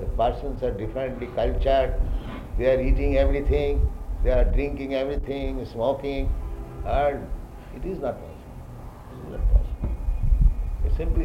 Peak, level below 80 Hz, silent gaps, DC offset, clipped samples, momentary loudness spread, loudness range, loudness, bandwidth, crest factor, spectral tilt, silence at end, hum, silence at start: -6 dBFS; -26 dBFS; none; under 0.1%; under 0.1%; 15 LU; 6 LU; -26 LUFS; 5.6 kHz; 18 dB; -8.5 dB/octave; 0 s; none; 0 s